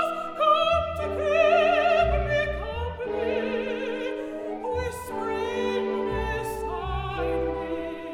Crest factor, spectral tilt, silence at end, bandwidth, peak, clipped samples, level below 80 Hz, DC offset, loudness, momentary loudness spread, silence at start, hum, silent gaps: 16 dB; -5.5 dB/octave; 0 s; 16.5 kHz; -10 dBFS; under 0.1%; -38 dBFS; under 0.1%; -26 LUFS; 11 LU; 0 s; none; none